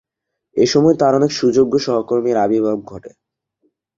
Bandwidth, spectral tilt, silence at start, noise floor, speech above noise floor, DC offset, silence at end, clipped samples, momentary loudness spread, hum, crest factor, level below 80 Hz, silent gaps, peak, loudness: 7.6 kHz; -6 dB/octave; 0.55 s; -73 dBFS; 58 dB; under 0.1%; 0.9 s; under 0.1%; 12 LU; none; 16 dB; -56 dBFS; none; -2 dBFS; -16 LUFS